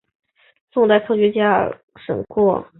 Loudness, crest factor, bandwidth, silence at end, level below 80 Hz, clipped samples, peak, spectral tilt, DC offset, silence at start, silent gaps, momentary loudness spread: -18 LUFS; 16 dB; 4.1 kHz; 0.15 s; -56 dBFS; under 0.1%; -2 dBFS; -11 dB/octave; under 0.1%; 0.75 s; 1.83-1.88 s; 11 LU